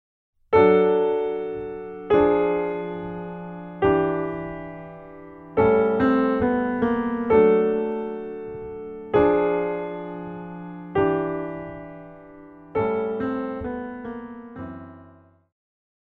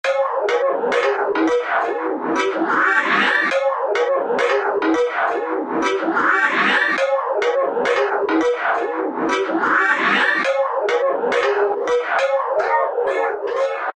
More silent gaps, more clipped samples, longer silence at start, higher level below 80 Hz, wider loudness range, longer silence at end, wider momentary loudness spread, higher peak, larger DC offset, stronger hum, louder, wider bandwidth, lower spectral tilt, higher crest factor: neither; neither; first, 0.5 s vs 0.05 s; first, -50 dBFS vs -64 dBFS; first, 9 LU vs 1 LU; first, 1 s vs 0.05 s; first, 19 LU vs 5 LU; about the same, -6 dBFS vs -4 dBFS; neither; neither; second, -23 LUFS vs -18 LUFS; second, 4.3 kHz vs 9.8 kHz; first, -9.5 dB/octave vs -3.5 dB/octave; about the same, 18 dB vs 16 dB